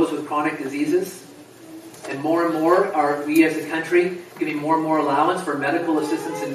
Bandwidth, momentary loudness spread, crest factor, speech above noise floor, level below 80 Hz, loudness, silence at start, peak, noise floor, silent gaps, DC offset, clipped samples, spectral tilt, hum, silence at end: 15 kHz; 14 LU; 18 dB; 22 dB; -72 dBFS; -21 LUFS; 0 s; -4 dBFS; -42 dBFS; none; under 0.1%; under 0.1%; -5.5 dB/octave; none; 0 s